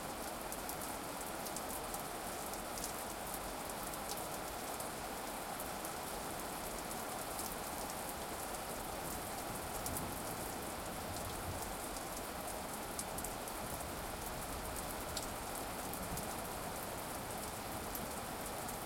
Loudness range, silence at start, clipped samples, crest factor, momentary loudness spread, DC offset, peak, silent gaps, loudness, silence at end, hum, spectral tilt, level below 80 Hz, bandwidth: 0 LU; 0 s; under 0.1%; 22 dB; 2 LU; under 0.1%; -22 dBFS; none; -42 LUFS; 0 s; none; -3 dB/octave; -56 dBFS; 17 kHz